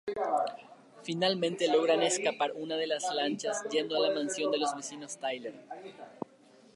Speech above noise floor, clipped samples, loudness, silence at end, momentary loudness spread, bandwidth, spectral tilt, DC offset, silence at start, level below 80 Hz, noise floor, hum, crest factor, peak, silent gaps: 28 dB; under 0.1%; -31 LUFS; 0.55 s; 18 LU; 11.5 kHz; -3 dB/octave; under 0.1%; 0.05 s; -80 dBFS; -59 dBFS; none; 16 dB; -16 dBFS; none